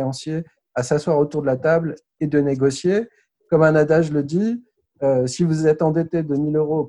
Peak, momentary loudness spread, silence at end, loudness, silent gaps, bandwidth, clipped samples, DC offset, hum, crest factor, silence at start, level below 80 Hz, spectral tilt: -4 dBFS; 11 LU; 0 s; -20 LUFS; none; 11 kHz; under 0.1%; under 0.1%; none; 16 dB; 0 s; -56 dBFS; -7 dB/octave